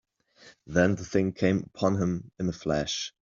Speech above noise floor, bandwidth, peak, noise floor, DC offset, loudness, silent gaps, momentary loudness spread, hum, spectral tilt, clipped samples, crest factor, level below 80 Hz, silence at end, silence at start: 29 dB; 7.4 kHz; -8 dBFS; -57 dBFS; under 0.1%; -28 LUFS; none; 7 LU; none; -5.5 dB/octave; under 0.1%; 20 dB; -54 dBFS; 0.15 s; 0.45 s